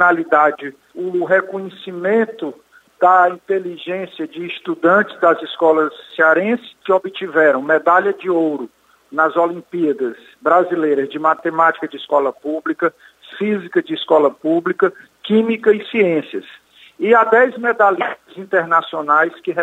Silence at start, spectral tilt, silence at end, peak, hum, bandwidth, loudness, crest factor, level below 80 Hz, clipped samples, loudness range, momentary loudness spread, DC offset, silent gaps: 0 s; -6.5 dB/octave; 0 s; -2 dBFS; none; 8.8 kHz; -16 LUFS; 16 dB; -70 dBFS; under 0.1%; 3 LU; 13 LU; under 0.1%; none